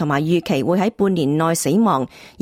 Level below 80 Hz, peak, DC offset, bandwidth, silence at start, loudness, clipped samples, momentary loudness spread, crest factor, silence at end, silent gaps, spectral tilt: -56 dBFS; -6 dBFS; under 0.1%; 16.5 kHz; 0 s; -18 LUFS; under 0.1%; 2 LU; 12 dB; 0.15 s; none; -6 dB/octave